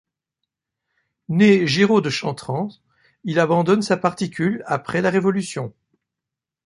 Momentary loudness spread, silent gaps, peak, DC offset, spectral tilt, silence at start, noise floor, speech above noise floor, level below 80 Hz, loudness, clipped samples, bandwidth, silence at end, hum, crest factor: 13 LU; none; -2 dBFS; under 0.1%; -6 dB/octave; 1.3 s; -86 dBFS; 67 dB; -62 dBFS; -19 LUFS; under 0.1%; 11.5 kHz; 0.95 s; none; 18 dB